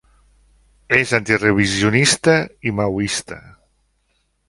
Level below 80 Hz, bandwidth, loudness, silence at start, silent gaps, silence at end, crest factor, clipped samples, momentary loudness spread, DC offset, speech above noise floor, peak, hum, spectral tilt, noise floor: -46 dBFS; 11.5 kHz; -17 LUFS; 0.9 s; none; 1.1 s; 20 dB; under 0.1%; 10 LU; under 0.1%; 49 dB; 0 dBFS; none; -4 dB/octave; -66 dBFS